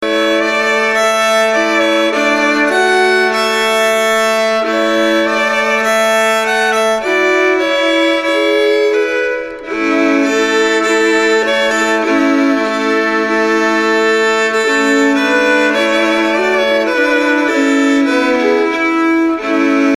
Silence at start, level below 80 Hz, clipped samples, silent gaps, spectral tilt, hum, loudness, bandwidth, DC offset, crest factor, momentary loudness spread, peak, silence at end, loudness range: 0 s; -50 dBFS; under 0.1%; none; -2.5 dB/octave; none; -12 LUFS; 14 kHz; under 0.1%; 10 dB; 2 LU; -2 dBFS; 0 s; 1 LU